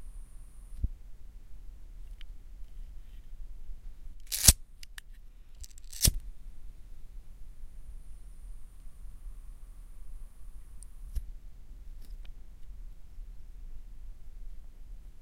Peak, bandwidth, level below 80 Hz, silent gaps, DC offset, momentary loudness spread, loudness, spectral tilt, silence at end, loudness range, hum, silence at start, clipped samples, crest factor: -2 dBFS; 16 kHz; -40 dBFS; none; under 0.1%; 24 LU; -28 LUFS; -1.5 dB/octave; 0 s; 23 LU; none; 0 s; under 0.1%; 36 dB